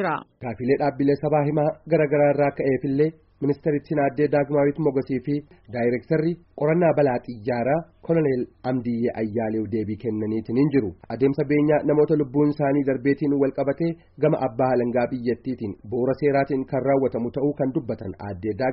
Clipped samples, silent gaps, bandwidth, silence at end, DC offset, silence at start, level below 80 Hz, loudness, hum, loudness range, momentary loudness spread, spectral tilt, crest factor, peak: under 0.1%; none; 5.6 kHz; 0 s; under 0.1%; 0 s; -56 dBFS; -23 LUFS; none; 3 LU; 8 LU; -8 dB/octave; 14 dB; -8 dBFS